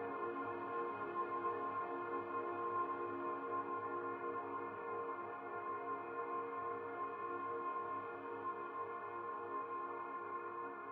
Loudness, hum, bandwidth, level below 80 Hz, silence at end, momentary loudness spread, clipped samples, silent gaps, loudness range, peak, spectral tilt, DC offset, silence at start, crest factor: -44 LUFS; none; 4.7 kHz; -86 dBFS; 0 s; 5 LU; under 0.1%; none; 2 LU; -30 dBFS; -4.5 dB/octave; under 0.1%; 0 s; 14 dB